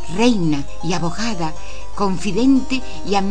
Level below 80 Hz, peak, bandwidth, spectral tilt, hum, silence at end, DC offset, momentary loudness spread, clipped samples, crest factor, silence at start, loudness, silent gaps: -36 dBFS; -2 dBFS; 10 kHz; -5.5 dB/octave; none; 0 s; 10%; 10 LU; under 0.1%; 18 dB; 0 s; -20 LUFS; none